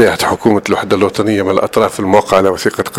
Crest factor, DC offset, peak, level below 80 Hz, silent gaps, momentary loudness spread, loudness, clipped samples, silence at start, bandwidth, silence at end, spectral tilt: 12 dB; under 0.1%; 0 dBFS; -44 dBFS; none; 4 LU; -12 LUFS; 0.2%; 0 s; 16.5 kHz; 0 s; -5 dB/octave